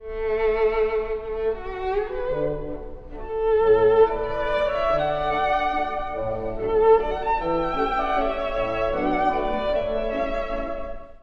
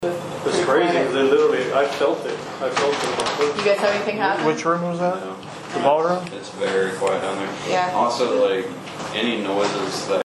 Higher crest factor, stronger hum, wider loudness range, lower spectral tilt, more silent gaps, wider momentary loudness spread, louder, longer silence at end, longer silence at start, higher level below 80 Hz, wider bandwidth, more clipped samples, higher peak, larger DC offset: about the same, 18 dB vs 16 dB; neither; about the same, 4 LU vs 2 LU; first, -7 dB/octave vs -4 dB/octave; neither; about the same, 11 LU vs 9 LU; about the same, -23 LUFS vs -21 LUFS; about the same, 0.05 s vs 0 s; about the same, 0 s vs 0 s; first, -36 dBFS vs -62 dBFS; second, 6.2 kHz vs 12.5 kHz; neither; about the same, -6 dBFS vs -4 dBFS; neither